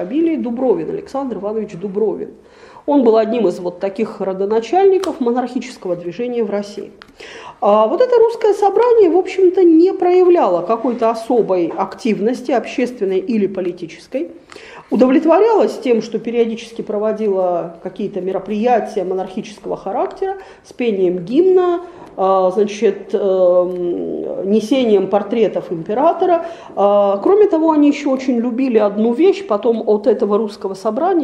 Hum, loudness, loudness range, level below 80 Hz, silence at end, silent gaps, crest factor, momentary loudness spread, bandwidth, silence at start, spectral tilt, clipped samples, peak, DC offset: none; -16 LUFS; 6 LU; -58 dBFS; 0 s; none; 14 dB; 12 LU; 11 kHz; 0 s; -6.5 dB/octave; under 0.1%; 0 dBFS; under 0.1%